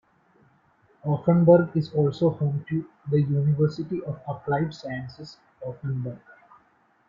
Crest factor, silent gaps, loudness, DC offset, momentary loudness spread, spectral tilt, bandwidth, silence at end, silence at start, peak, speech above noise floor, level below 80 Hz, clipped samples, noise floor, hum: 20 dB; none; -25 LUFS; under 0.1%; 19 LU; -9.5 dB/octave; 7.2 kHz; 0.9 s; 1.05 s; -4 dBFS; 39 dB; -62 dBFS; under 0.1%; -63 dBFS; none